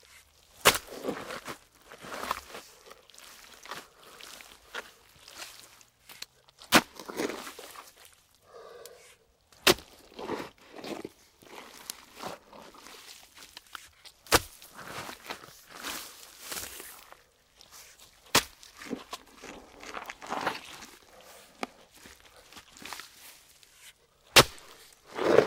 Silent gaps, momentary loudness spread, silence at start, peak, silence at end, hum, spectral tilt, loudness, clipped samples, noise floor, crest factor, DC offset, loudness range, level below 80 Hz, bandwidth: none; 27 LU; 0.6 s; -4 dBFS; 0 s; none; -2 dB/octave; -30 LUFS; under 0.1%; -62 dBFS; 30 dB; under 0.1%; 15 LU; -60 dBFS; 16 kHz